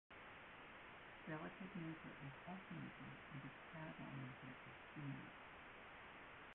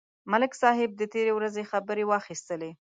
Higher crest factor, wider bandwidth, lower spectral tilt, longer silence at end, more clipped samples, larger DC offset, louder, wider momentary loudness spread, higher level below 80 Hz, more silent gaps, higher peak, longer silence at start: about the same, 16 dB vs 20 dB; second, 4 kHz vs 9.4 kHz; about the same, -4.5 dB/octave vs -4.5 dB/octave; second, 0 s vs 0.25 s; neither; neither; second, -55 LUFS vs -28 LUFS; second, 6 LU vs 11 LU; about the same, -76 dBFS vs -78 dBFS; neither; second, -38 dBFS vs -8 dBFS; second, 0.1 s vs 0.25 s